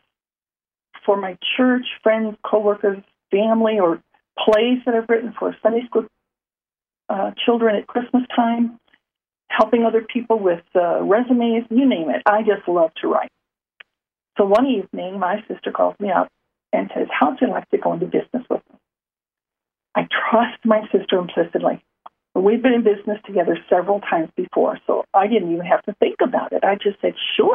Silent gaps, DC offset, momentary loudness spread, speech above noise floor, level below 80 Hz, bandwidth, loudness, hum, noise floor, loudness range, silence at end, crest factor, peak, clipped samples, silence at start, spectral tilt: none; under 0.1%; 8 LU; over 72 dB; -66 dBFS; 5.6 kHz; -19 LUFS; none; under -90 dBFS; 3 LU; 0 s; 18 dB; -2 dBFS; under 0.1%; 0.95 s; -7.5 dB/octave